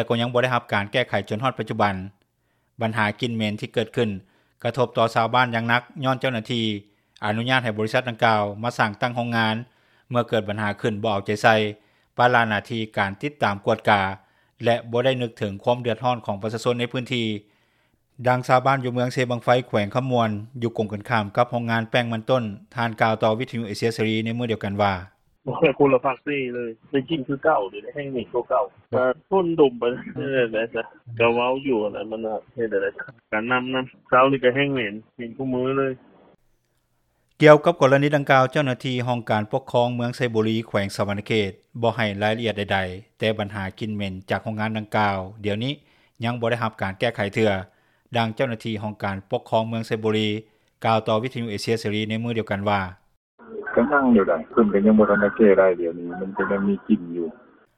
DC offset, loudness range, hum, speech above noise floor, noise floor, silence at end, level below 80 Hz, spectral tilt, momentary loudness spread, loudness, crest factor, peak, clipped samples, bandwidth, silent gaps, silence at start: under 0.1%; 6 LU; none; 47 dB; -69 dBFS; 0.4 s; -60 dBFS; -6.5 dB/octave; 11 LU; -23 LUFS; 22 dB; 0 dBFS; under 0.1%; 14 kHz; 53.17-53.38 s; 0 s